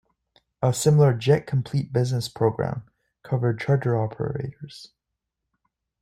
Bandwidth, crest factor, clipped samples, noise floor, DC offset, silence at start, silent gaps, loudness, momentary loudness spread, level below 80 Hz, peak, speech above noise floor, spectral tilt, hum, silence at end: 15.5 kHz; 18 dB; under 0.1%; -83 dBFS; under 0.1%; 0.6 s; none; -23 LUFS; 16 LU; -56 dBFS; -6 dBFS; 60 dB; -6.5 dB/octave; none; 1.15 s